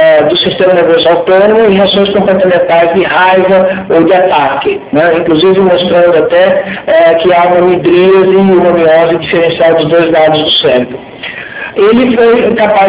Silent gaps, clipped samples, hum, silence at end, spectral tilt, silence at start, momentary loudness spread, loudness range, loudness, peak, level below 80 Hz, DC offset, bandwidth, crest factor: none; 4%; none; 0 s; -9.5 dB/octave; 0 s; 4 LU; 2 LU; -7 LUFS; 0 dBFS; -42 dBFS; under 0.1%; 4 kHz; 6 dB